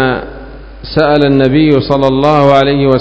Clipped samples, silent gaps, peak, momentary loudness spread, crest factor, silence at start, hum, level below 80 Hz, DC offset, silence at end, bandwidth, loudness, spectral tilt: 1%; none; 0 dBFS; 11 LU; 10 dB; 0 s; none; -30 dBFS; under 0.1%; 0 s; 8 kHz; -9 LUFS; -8 dB/octave